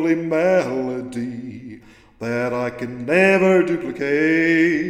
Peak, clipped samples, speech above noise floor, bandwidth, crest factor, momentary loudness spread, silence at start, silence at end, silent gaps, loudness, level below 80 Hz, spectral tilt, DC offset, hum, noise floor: -2 dBFS; under 0.1%; 24 dB; 11 kHz; 18 dB; 16 LU; 0 s; 0 s; none; -19 LUFS; -56 dBFS; -6.5 dB/octave; under 0.1%; none; -43 dBFS